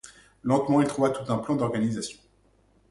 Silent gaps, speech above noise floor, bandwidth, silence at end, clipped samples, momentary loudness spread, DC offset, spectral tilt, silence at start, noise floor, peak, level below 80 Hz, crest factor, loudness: none; 38 dB; 11.5 kHz; 0.75 s; under 0.1%; 12 LU; under 0.1%; -6.5 dB/octave; 0.05 s; -63 dBFS; -10 dBFS; -60 dBFS; 18 dB; -26 LUFS